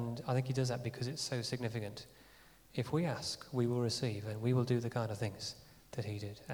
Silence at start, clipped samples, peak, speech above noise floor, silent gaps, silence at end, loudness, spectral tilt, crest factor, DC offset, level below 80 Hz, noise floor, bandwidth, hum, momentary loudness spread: 0 s; under 0.1%; -20 dBFS; 25 dB; none; 0 s; -38 LUFS; -5.5 dB/octave; 18 dB; under 0.1%; -68 dBFS; -62 dBFS; over 20 kHz; none; 11 LU